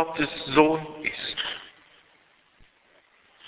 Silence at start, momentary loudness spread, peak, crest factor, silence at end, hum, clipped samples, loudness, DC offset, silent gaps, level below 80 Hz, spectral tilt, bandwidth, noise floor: 0 s; 14 LU; -4 dBFS; 26 dB; 0 s; none; under 0.1%; -25 LUFS; under 0.1%; none; -60 dBFS; -8.5 dB/octave; 4 kHz; -61 dBFS